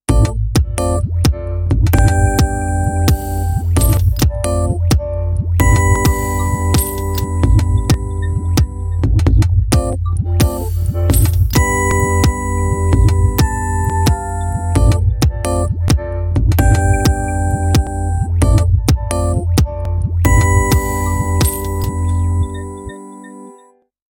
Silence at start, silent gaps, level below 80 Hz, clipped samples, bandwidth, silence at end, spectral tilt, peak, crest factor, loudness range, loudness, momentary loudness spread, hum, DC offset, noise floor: 0.1 s; none; -18 dBFS; under 0.1%; 17 kHz; 0.6 s; -6 dB/octave; 0 dBFS; 14 dB; 1 LU; -15 LUFS; 6 LU; none; under 0.1%; -48 dBFS